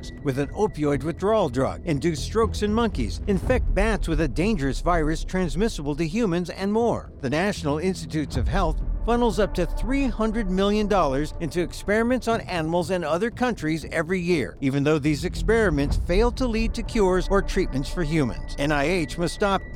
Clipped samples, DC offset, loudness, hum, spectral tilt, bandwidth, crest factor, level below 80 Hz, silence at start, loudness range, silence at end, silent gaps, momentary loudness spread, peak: under 0.1%; under 0.1%; -24 LUFS; none; -6 dB/octave; 15 kHz; 14 dB; -30 dBFS; 0 s; 2 LU; 0 s; none; 5 LU; -8 dBFS